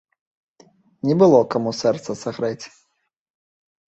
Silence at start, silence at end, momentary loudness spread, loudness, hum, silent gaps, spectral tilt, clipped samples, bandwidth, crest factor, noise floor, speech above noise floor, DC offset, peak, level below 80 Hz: 1.05 s; 1.2 s; 15 LU; -19 LUFS; none; none; -6.5 dB/octave; under 0.1%; 8.2 kHz; 20 dB; -74 dBFS; 55 dB; under 0.1%; -2 dBFS; -64 dBFS